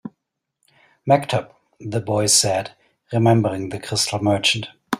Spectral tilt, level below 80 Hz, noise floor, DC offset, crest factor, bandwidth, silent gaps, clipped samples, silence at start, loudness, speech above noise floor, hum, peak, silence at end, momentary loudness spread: -4 dB/octave; -58 dBFS; -78 dBFS; under 0.1%; 20 dB; 15.5 kHz; none; under 0.1%; 0.05 s; -19 LUFS; 58 dB; none; -2 dBFS; 0 s; 14 LU